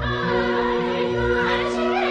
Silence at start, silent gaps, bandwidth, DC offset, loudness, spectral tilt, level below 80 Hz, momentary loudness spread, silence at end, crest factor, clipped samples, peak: 0 s; none; 9.2 kHz; under 0.1%; -21 LUFS; -6 dB/octave; -38 dBFS; 2 LU; 0 s; 12 dB; under 0.1%; -10 dBFS